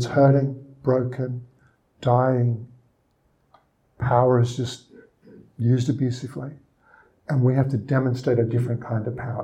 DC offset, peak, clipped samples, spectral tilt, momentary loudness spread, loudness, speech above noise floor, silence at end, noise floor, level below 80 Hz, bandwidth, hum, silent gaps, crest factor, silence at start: under 0.1%; -4 dBFS; under 0.1%; -8 dB/octave; 14 LU; -23 LUFS; 44 dB; 0 s; -66 dBFS; -56 dBFS; 8.8 kHz; none; none; 20 dB; 0 s